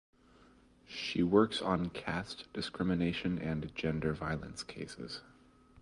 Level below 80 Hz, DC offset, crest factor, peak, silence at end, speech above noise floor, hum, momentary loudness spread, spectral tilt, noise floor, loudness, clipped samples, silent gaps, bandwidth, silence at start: -56 dBFS; under 0.1%; 22 dB; -14 dBFS; 0.6 s; 28 dB; none; 15 LU; -6 dB/octave; -63 dBFS; -35 LUFS; under 0.1%; none; 11.5 kHz; 0.9 s